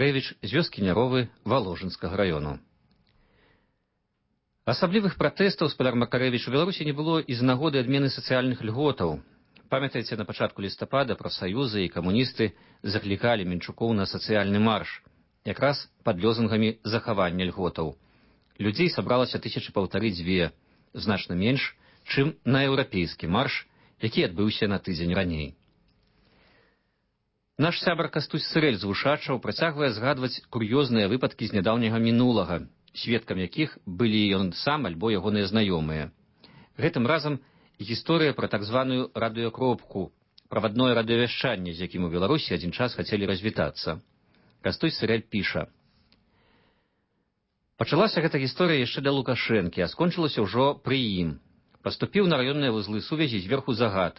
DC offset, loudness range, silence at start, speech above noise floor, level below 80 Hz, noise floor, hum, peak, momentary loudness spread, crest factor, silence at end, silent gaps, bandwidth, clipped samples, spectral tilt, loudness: under 0.1%; 5 LU; 0 s; 50 dB; -50 dBFS; -76 dBFS; none; -10 dBFS; 9 LU; 16 dB; 0.05 s; none; 5.8 kHz; under 0.1%; -10 dB/octave; -26 LUFS